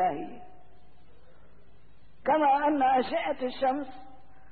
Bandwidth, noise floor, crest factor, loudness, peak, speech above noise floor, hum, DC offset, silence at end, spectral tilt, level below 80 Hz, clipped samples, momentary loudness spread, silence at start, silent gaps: 4.7 kHz; -60 dBFS; 14 dB; -27 LUFS; -16 dBFS; 33 dB; none; 0.7%; 0.4 s; -8.5 dB/octave; -62 dBFS; under 0.1%; 15 LU; 0 s; none